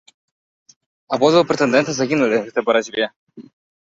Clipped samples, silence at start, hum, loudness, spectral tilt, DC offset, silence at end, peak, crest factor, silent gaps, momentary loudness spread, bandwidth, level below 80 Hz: under 0.1%; 1.1 s; none; -18 LUFS; -4.5 dB/octave; under 0.1%; 0.45 s; -2 dBFS; 18 dB; 3.16-3.27 s; 9 LU; 7.8 kHz; -62 dBFS